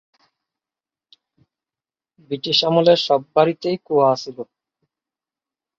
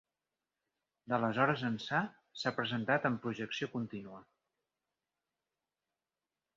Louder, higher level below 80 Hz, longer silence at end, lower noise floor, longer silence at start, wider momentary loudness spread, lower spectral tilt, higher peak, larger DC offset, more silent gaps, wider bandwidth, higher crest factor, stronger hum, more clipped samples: first, -18 LUFS vs -35 LUFS; first, -66 dBFS vs -76 dBFS; second, 1.35 s vs 2.35 s; about the same, under -90 dBFS vs under -90 dBFS; first, 2.3 s vs 1.05 s; first, 17 LU vs 12 LU; first, -5.5 dB/octave vs -4 dB/octave; first, -2 dBFS vs -14 dBFS; neither; neither; about the same, 7.6 kHz vs 7.4 kHz; about the same, 20 dB vs 24 dB; neither; neither